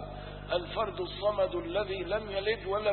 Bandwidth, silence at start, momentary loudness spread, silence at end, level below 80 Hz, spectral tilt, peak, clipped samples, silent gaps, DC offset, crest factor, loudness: 4.4 kHz; 0 s; 4 LU; 0 s; -48 dBFS; -9 dB/octave; -16 dBFS; under 0.1%; none; under 0.1%; 16 dB; -33 LUFS